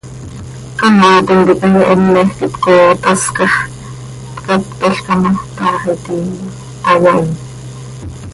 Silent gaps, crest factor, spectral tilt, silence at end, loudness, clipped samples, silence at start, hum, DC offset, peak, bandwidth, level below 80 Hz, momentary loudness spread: none; 12 dB; -5.5 dB/octave; 0 s; -11 LUFS; under 0.1%; 0.05 s; none; under 0.1%; 0 dBFS; 11.5 kHz; -40 dBFS; 20 LU